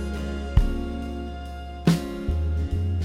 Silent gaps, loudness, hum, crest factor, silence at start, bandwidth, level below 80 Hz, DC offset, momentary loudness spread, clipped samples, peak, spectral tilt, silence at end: none; -27 LUFS; none; 20 dB; 0 s; 14.5 kHz; -28 dBFS; under 0.1%; 11 LU; under 0.1%; -6 dBFS; -7 dB/octave; 0 s